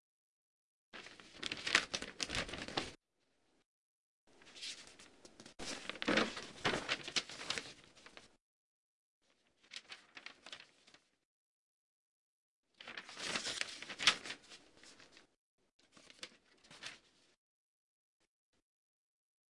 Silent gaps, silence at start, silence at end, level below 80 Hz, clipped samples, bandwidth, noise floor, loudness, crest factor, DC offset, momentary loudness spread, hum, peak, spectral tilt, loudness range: 3.66-4.27 s, 8.41-9.21 s, 11.25-12.63 s, 15.37-15.58 s, 15.73-15.79 s; 0.95 s; 2.55 s; -70 dBFS; under 0.1%; 11.5 kHz; -81 dBFS; -39 LUFS; 34 dB; under 0.1%; 25 LU; none; -12 dBFS; -1.5 dB/octave; 17 LU